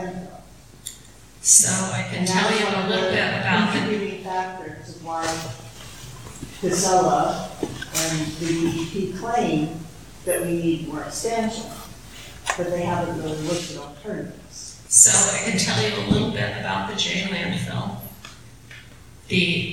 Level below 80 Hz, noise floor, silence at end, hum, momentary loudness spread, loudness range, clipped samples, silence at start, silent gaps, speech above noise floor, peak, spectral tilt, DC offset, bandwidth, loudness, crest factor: -48 dBFS; -46 dBFS; 0 s; none; 20 LU; 9 LU; under 0.1%; 0 s; none; 24 dB; 0 dBFS; -3 dB/octave; 0.3%; 19 kHz; -21 LUFS; 24 dB